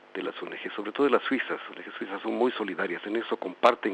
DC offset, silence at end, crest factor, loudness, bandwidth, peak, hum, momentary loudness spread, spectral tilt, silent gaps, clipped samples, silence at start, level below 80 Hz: under 0.1%; 0 s; 26 dB; -29 LUFS; 9.4 kHz; -4 dBFS; none; 12 LU; -5.5 dB/octave; none; under 0.1%; 0.15 s; -82 dBFS